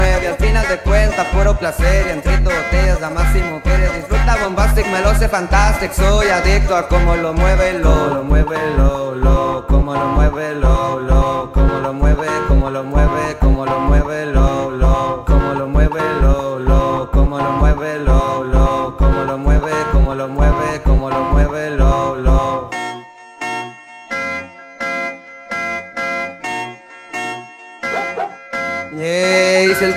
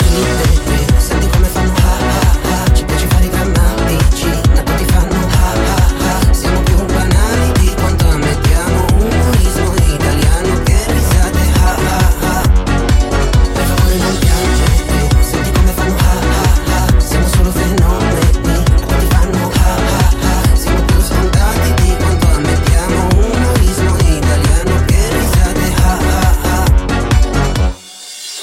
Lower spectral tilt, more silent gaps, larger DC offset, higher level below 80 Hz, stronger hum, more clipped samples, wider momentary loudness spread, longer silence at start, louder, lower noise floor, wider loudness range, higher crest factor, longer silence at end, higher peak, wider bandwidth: about the same, -6 dB/octave vs -5.5 dB/octave; neither; neither; about the same, -16 dBFS vs -12 dBFS; neither; neither; first, 9 LU vs 1 LU; about the same, 0 s vs 0 s; second, -16 LUFS vs -12 LUFS; about the same, -34 dBFS vs -31 dBFS; first, 8 LU vs 0 LU; about the same, 14 dB vs 10 dB; about the same, 0 s vs 0 s; about the same, 0 dBFS vs 0 dBFS; second, 13.5 kHz vs 16.5 kHz